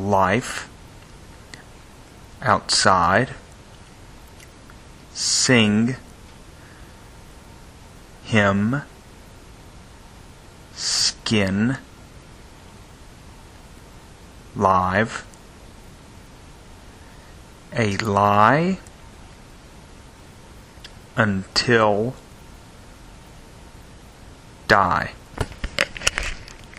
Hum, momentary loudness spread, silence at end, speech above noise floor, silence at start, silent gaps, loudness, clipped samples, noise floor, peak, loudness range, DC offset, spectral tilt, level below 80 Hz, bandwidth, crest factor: none; 26 LU; 0.05 s; 25 dB; 0 s; none; -20 LUFS; under 0.1%; -44 dBFS; 0 dBFS; 4 LU; under 0.1%; -4 dB/octave; -44 dBFS; 14.5 kHz; 24 dB